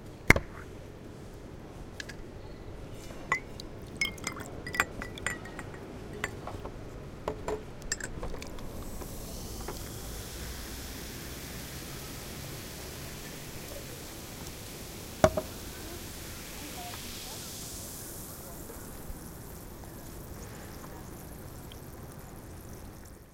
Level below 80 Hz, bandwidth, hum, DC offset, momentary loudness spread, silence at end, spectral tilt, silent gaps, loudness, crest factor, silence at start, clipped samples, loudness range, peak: -46 dBFS; 17 kHz; none; under 0.1%; 14 LU; 0 s; -3.5 dB/octave; none; -37 LUFS; 36 dB; 0 s; under 0.1%; 9 LU; -2 dBFS